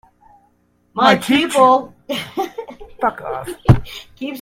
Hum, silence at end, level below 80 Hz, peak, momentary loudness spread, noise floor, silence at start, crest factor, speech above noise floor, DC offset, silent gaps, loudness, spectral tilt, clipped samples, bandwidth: 60 Hz at -50 dBFS; 0 s; -36 dBFS; 0 dBFS; 17 LU; -59 dBFS; 0.95 s; 18 dB; 43 dB; under 0.1%; none; -17 LUFS; -6 dB/octave; under 0.1%; 16 kHz